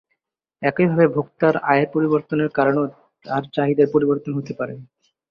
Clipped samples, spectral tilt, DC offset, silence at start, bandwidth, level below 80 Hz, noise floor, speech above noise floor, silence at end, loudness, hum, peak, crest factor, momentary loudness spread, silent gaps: under 0.1%; -9.5 dB/octave; under 0.1%; 0.6 s; 6 kHz; -62 dBFS; -75 dBFS; 56 dB; 0.45 s; -20 LUFS; none; -2 dBFS; 18 dB; 11 LU; none